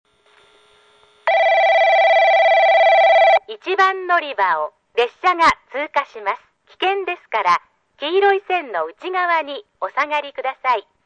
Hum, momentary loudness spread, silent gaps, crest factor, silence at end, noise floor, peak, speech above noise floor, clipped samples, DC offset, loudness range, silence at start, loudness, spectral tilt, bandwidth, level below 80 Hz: none; 13 LU; none; 14 dB; 0.25 s; -54 dBFS; -4 dBFS; 35 dB; under 0.1%; under 0.1%; 7 LU; 1.25 s; -17 LUFS; -2.5 dB/octave; 9.2 kHz; -60 dBFS